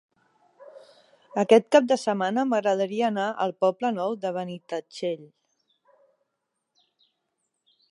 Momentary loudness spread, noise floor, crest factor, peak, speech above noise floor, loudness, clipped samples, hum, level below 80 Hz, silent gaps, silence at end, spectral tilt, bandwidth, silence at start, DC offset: 14 LU; -80 dBFS; 24 dB; -4 dBFS; 57 dB; -25 LUFS; under 0.1%; none; -84 dBFS; none; 2.65 s; -5 dB/octave; 11.5 kHz; 0.6 s; under 0.1%